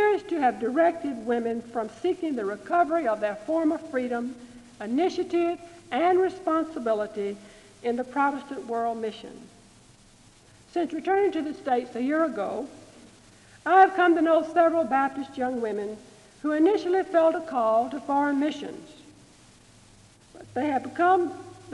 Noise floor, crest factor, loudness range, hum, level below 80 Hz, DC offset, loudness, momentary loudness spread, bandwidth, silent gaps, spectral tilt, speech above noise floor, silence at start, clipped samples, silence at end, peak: -55 dBFS; 20 dB; 7 LU; none; -66 dBFS; under 0.1%; -26 LUFS; 13 LU; 11.5 kHz; none; -5.5 dB/octave; 30 dB; 0 s; under 0.1%; 0 s; -6 dBFS